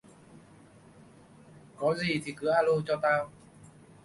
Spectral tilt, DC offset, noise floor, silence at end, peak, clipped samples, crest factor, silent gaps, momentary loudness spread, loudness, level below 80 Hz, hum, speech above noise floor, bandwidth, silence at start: -5.5 dB/octave; under 0.1%; -55 dBFS; 0.4 s; -14 dBFS; under 0.1%; 18 dB; none; 6 LU; -29 LUFS; -66 dBFS; none; 27 dB; 11.5 kHz; 1.55 s